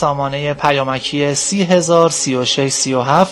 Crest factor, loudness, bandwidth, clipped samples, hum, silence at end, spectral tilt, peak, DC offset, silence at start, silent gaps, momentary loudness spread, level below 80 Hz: 14 dB; -15 LUFS; 12 kHz; 0.3%; none; 0 s; -3.5 dB/octave; 0 dBFS; under 0.1%; 0 s; none; 5 LU; -50 dBFS